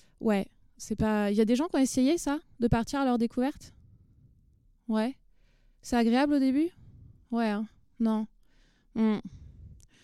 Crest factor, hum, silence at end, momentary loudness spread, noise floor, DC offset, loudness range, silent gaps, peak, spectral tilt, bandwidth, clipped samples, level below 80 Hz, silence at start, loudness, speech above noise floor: 18 dB; none; 0.3 s; 16 LU; -63 dBFS; under 0.1%; 5 LU; none; -12 dBFS; -5.5 dB/octave; 14 kHz; under 0.1%; -52 dBFS; 0.2 s; -29 LUFS; 36 dB